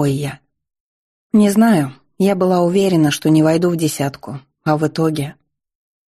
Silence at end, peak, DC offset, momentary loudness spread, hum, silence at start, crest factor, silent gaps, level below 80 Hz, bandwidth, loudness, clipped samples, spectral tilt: 0.75 s; -4 dBFS; under 0.1%; 12 LU; none; 0 s; 14 dB; 0.80-1.30 s; -56 dBFS; 13 kHz; -16 LUFS; under 0.1%; -6.5 dB/octave